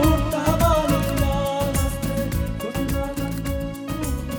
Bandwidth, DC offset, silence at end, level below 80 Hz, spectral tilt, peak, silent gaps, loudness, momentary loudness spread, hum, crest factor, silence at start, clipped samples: over 20 kHz; under 0.1%; 0 s; -28 dBFS; -6 dB/octave; -4 dBFS; none; -23 LUFS; 8 LU; none; 18 dB; 0 s; under 0.1%